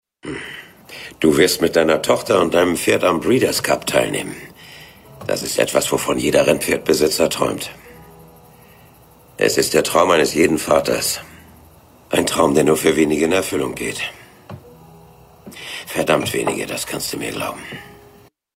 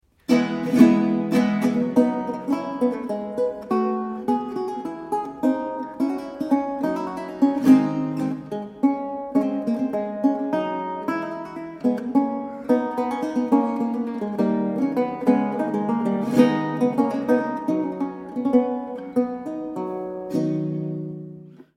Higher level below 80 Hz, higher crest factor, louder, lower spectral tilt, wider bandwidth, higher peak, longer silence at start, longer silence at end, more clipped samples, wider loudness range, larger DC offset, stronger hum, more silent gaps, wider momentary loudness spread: first, -48 dBFS vs -62 dBFS; about the same, 20 dB vs 22 dB; first, -17 LUFS vs -23 LUFS; second, -3.5 dB/octave vs -7.5 dB/octave; first, 16 kHz vs 14 kHz; about the same, 0 dBFS vs -2 dBFS; about the same, 0.25 s vs 0.3 s; first, 0.6 s vs 0.15 s; neither; first, 7 LU vs 4 LU; neither; neither; neither; first, 19 LU vs 10 LU